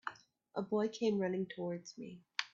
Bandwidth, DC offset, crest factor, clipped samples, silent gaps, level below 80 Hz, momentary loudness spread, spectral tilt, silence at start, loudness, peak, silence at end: 7.6 kHz; under 0.1%; 24 dB; under 0.1%; none; -82 dBFS; 13 LU; -4.5 dB/octave; 0.05 s; -39 LUFS; -14 dBFS; 0.05 s